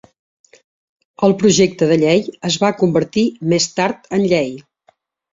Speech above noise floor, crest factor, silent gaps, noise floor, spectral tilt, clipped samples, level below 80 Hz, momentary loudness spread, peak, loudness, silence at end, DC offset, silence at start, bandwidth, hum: 43 dB; 16 dB; none; -58 dBFS; -5 dB/octave; under 0.1%; -54 dBFS; 6 LU; -2 dBFS; -16 LUFS; 0.7 s; under 0.1%; 1.2 s; 7.8 kHz; none